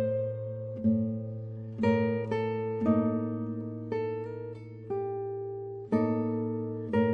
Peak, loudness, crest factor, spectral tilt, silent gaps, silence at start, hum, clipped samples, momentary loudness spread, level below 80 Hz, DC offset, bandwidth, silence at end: -14 dBFS; -32 LUFS; 18 dB; -10 dB/octave; none; 0 s; none; under 0.1%; 11 LU; -68 dBFS; under 0.1%; 5.2 kHz; 0 s